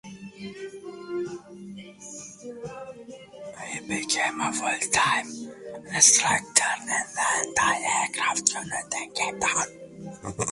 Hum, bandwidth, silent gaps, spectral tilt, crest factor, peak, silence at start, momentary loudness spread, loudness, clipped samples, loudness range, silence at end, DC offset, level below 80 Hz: none; 12 kHz; none; -1 dB/octave; 26 dB; -2 dBFS; 0.05 s; 21 LU; -23 LUFS; under 0.1%; 16 LU; 0 s; under 0.1%; -60 dBFS